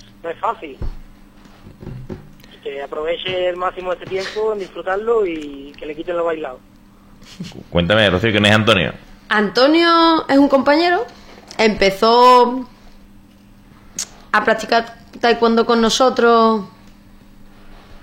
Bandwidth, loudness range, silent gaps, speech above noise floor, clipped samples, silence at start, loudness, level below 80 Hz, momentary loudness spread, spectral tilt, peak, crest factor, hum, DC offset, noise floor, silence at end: 16.5 kHz; 10 LU; none; 30 dB; under 0.1%; 0.25 s; -15 LUFS; -40 dBFS; 21 LU; -4.5 dB/octave; 0 dBFS; 18 dB; none; under 0.1%; -45 dBFS; 0.05 s